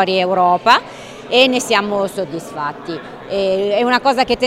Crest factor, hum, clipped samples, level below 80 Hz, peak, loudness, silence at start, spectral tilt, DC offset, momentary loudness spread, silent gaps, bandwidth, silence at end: 16 dB; none; under 0.1%; -52 dBFS; 0 dBFS; -15 LUFS; 0 s; -3.5 dB/octave; under 0.1%; 15 LU; none; 16 kHz; 0 s